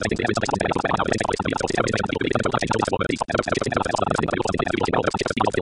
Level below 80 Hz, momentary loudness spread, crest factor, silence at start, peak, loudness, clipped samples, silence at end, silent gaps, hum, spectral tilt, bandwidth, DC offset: -42 dBFS; 1 LU; 18 dB; 0 s; -4 dBFS; -23 LUFS; under 0.1%; 0 s; none; none; -5 dB/octave; 11.5 kHz; 0.1%